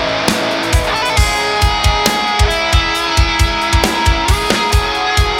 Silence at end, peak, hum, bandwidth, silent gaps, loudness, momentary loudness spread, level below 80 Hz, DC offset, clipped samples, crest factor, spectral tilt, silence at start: 0 s; 0 dBFS; none; 17.5 kHz; none; -13 LUFS; 2 LU; -18 dBFS; under 0.1%; under 0.1%; 14 dB; -3.5 dB/octave; 0 s